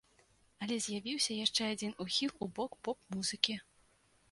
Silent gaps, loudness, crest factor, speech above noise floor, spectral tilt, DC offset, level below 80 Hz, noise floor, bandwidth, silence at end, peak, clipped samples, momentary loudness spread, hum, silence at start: none; -36 LUFS; 30 dB; 33 dB; -2.5 dB/octave; under 0.1%; -72 dBFS; -70 dBFS; 11.5 kHz; 0.7 s; -8 dBFS; under 0.1%; 8 LU; none; 0.6 s